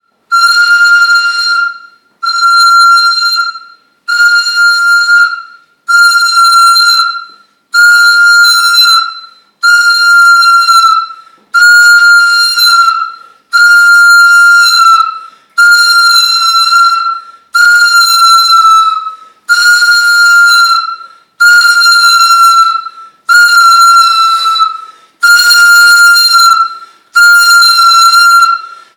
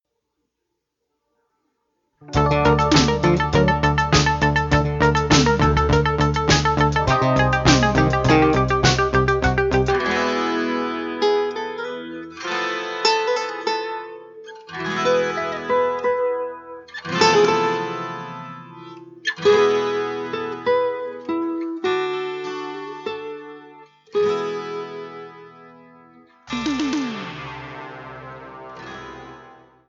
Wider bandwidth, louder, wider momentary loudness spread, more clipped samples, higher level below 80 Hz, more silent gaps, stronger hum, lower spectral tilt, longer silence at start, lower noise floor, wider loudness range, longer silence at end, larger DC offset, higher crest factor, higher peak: first, 19.5 kHz vs 7.8 kHz; first, -4 LUFS vs -20 LUFS; second, 11 LU vs 20 LU; first, 0.3% vs under 0.1%; second, -58 dBFS vs -36 dBFS; neither; neither; second, 6 dB/octave vs -5 dB/octave; second, 0.3 s vs 2.2 s; second, -37 dBFS vs -78 dBFS; second, 3 LU vs 12 LU; about the same, 0.3 s vs 0.4 s; neither; second, 6 dB vs 20 dB; about the same, 0 dBFS vs -2 dBFS